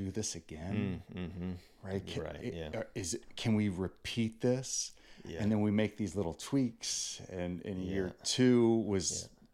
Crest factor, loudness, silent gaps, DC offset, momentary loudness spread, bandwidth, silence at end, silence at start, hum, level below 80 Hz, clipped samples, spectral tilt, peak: 18 dB; -35 LUFS; none; under 0.1%; 12 LU; 14.5 kHz; 0.25 s; 0 s; none; -60 dBFS; under 0.1%; -5 dB/octave; -18 dBFS